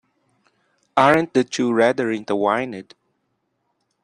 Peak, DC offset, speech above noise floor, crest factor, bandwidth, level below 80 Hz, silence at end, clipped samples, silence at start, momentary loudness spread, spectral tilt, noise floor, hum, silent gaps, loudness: -2 dBFS; under 0.1%; 53 dB; 20 dB; 10.5 kHz; -64 dBFS; 1.2 s; under 0.1%; 0.95 s; 8 LU; -5 dB/octave; -72 dBFS; none; none; -19 LUFS